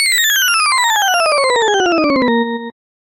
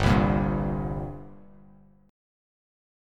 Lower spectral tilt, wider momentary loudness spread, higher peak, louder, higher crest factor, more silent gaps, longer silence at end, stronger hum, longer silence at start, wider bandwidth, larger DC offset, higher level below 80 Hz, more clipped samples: second, -1 dB/octave vs -7.5 dB/octave; second, 8 LU vs 21 LU; first, -2 dBFS vs -8 dBFS; first, -12 LUFS vs -27 LUFS; second, 12 dB vs 20 dB; neither; second, 0.3 s vs 1.75 s; second, none vs 50 Hz at -55 dBFS; about the same, 0 s vs 0 s; first, 17 kHz vs 12 kHz; neither; second, -54 dBFS vs -38 dBFS; neither